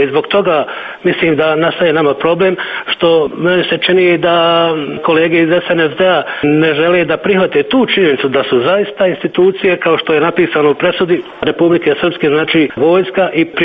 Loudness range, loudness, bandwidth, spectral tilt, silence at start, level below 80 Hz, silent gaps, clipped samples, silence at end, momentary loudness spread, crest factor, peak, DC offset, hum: 1 LU; -12 LUFS; 4.9 kHz; -8.5 dB/octave; 0 s; -50 dBFS; none; under 0.1%; 0 s; 4 LU; 10 dB; 0 dBFS; under 0.1%; none